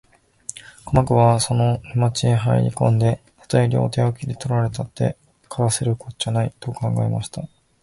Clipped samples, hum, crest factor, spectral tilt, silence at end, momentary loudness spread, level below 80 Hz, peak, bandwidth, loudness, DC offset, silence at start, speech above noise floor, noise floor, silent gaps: under 0.1%; none; 18 dB; -6 dB/octave; 0.35 s; 17 LU; -44 dBFS; -2 dBFS; 11.5 kHz; -20 LUFS; under 0.1%; 0.55 s; 21 dB; -40 dBFS; none